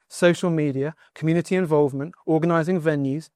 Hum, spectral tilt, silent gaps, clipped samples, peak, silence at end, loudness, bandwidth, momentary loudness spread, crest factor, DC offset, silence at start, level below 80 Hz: none; -7 dB/octave; none; under 0.1%; -6 dBFS; 0.1 s; -22 LUFS; 13 kHz; 8 LU; 16 dB; under 0.1%; 0.1 s; -66 dBFS